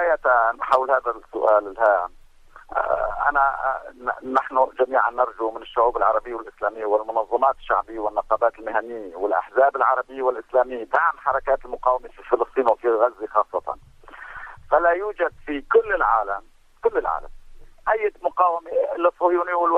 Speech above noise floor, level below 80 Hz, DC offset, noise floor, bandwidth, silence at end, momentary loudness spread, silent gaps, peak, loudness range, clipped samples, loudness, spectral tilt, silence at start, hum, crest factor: 25 dB; -48 dBFS; under 0.1%; -47 dBFS; 7.8 kHz; 0 s; 10 LU; none; -4 dBFS; 2 LU; under 0.1%; -22 LUFS; -5.5 dB/octave; 0 s; none; 18 dB